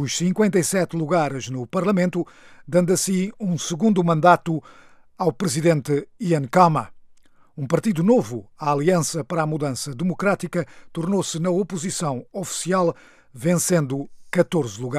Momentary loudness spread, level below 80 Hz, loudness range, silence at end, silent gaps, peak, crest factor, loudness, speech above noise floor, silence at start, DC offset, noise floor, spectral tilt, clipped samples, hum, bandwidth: 10 LU; -60 dBFS; 4 LU; 0 s; none; -2 dBFS; 20 dB; -22 LUFS; 29 dB; 0 s; under 0.1%; -50 dBFS; -5.5 dB/octave; under 0.1%; none; 15.5 kHz